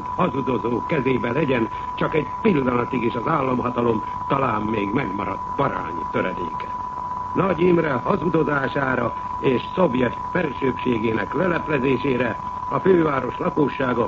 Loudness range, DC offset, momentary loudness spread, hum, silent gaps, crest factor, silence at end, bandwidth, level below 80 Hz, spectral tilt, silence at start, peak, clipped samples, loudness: 2 LU; under 0.1%; 7 LU; none; none; 16 dB; 0 s; 7.4 kHz; -46 dBFS; -8 dB/octave; 0 s; -4 dBFS; under 0.1%; -22 LUFS